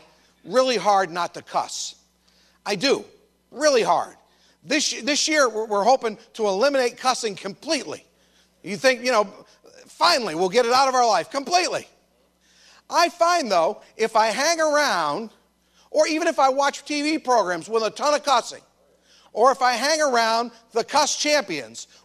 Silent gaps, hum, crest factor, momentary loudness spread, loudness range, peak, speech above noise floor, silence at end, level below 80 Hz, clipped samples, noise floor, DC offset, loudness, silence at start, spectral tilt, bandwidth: none; none; 18 dB; 11 LU; 3 LU; -6 dBFS; 41 dB; 0.2 s; -72 dBFS; under 0.1%; -63 dBFS; under 0.1%; -21 LUFS; 0.45 s; -2 dB/octave; 14 kHz